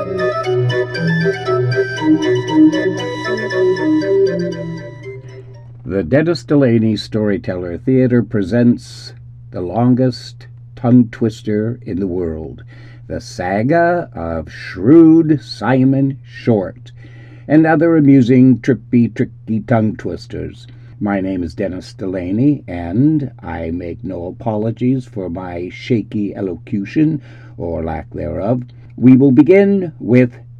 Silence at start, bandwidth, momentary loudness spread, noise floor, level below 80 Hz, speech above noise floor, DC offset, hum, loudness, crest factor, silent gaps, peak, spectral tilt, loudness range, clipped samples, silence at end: 0 s; 9 kHz; 16 LU; -34 dBFS; -42 dBFS; 20 dB; under 0.1%; none; -15 LUFS; 16 dB; none; 0 dBFS; -8 dB/octave; 7 LU; under 0.1%; 0 s